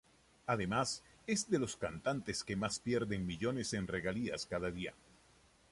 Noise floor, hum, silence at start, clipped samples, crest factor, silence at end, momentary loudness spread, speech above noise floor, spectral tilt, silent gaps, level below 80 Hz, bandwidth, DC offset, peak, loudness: -67 dBFS; none; 0.45 s; under 0.1%; 18 dB; 0.8 s; 5 LU; 29 dB; -4.5 dB/octave; none; -60 dBFS; 11.5 kHz; under 0.1%; -20 dBFS; -38 LUFS